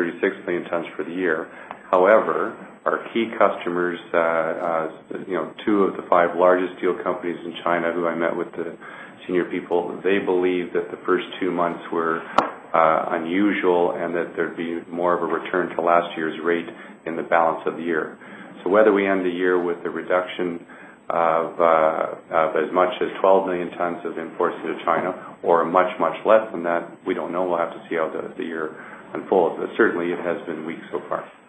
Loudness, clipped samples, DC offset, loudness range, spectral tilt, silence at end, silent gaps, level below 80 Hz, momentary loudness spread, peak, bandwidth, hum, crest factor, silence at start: -22 LUFS; under 0.1%; under 0.1%; 3 LU; -7 dB/octave; 0.15 s; none; -70 dBFS; 12 LU; 0 dBFS; 8.4 kHz; none; 22 dB; 0 s